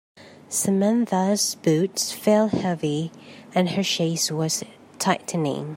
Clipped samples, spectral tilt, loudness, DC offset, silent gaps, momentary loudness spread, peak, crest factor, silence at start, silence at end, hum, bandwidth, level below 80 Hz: under 0.1%; -4.5 dB/octave; -23 LUFS; under 0.1%; none; 7 LU; -4 dBFS; 18 dB; 0.2 s; 0 s; none; 16.5 kHz; -66 dBFS